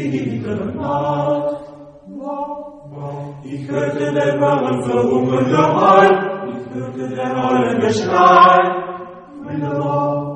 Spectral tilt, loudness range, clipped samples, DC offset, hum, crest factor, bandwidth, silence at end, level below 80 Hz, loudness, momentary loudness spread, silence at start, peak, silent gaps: -6.5 dB/octave; 10 LU; under 0.1%; under 0.1%; none; 16 dB; 10 kHz; 0 s; -54 dBFS; -16 LUFS; 19 LU; 0 s; 0 dBFS; none